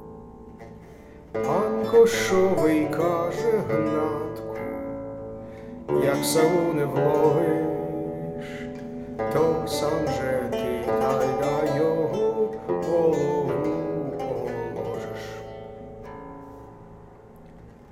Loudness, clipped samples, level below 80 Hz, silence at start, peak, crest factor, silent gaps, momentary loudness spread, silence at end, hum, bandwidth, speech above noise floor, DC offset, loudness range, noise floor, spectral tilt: -24 LUFS; under 0.1%; -52 dBFS; 0 s; -6 dBFS; 18 dB; none; 19 LU; 0 s; none; 16 kHz; 25 dB; under 0.1%; 8 LU; -47 dBFS; -6 dB/octave